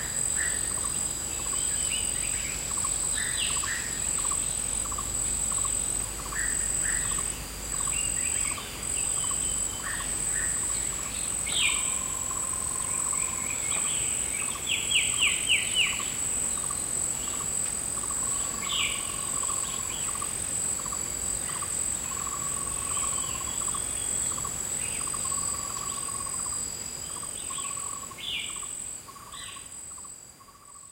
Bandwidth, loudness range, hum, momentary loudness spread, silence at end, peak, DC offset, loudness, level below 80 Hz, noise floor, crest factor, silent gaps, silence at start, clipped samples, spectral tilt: 16 kHz; 5 LU; none; 8 LU; 0 s; -12 dBFS; under 0.1%; -27 LUFS; -48 dBFS; -50 dBFS; 18 dB; none; 0 s; under 0.1%; 0 dB/octave